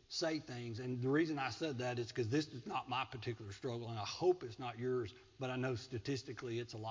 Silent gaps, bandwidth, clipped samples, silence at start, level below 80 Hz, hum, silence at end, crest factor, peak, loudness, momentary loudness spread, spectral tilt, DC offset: none; 7.6 kHz; under 0.1%; 0.1 s; -70 dBFS; none; 0 s; 18 dB; -22 dBFS; -41 LUFS; 9 LU; -5.5 dB/octave; under 0.1%